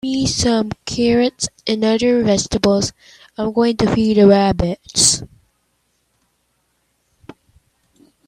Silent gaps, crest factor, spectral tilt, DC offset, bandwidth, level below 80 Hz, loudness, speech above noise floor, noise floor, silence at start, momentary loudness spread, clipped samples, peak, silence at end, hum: none; 18 dB; -4 dB/octave; under 0.1%; 14.5 kHz; -40 dBFS; -16 LUFS; 50 dB; -66 dBFS; 0.05 s; 10 LU; under 0.1%; 0 dBFS; 3.05 s; none